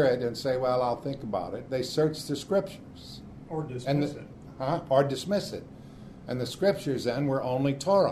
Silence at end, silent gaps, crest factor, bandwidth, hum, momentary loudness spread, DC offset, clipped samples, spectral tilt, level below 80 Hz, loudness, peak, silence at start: 0 s; none; 20 dB; 13.5 kHz; none; 19 LU; under 0.1%; under 0.1%; -6 dB/octave; -56 dBFS; -29 LUFS; -10 dBFS; 0 s